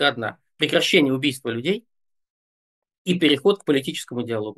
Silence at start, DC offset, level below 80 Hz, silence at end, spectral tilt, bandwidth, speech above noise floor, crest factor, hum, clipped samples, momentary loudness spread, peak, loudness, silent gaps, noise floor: 0 s; under 0.1%; -72 dBFS; 0.05 s; -4.5 dB/octave; 12.5 kHz; over 69 dB; 20 dB; none; under 0.1%; 12 LU; -2 dBFS; -21 LUFS; 2.30-2.82 s, 2.98-3.05 s; under -90 dBFS